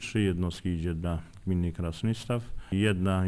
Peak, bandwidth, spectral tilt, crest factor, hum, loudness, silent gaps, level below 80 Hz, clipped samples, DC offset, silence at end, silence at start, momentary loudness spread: -12 dBFS; 11 kHz; -7 dB/octave; 16 dB; none; -31 LUFS; none; -44 dBFS; under 0.1%; under 0.1%; 0 s; 0 s; 7 LU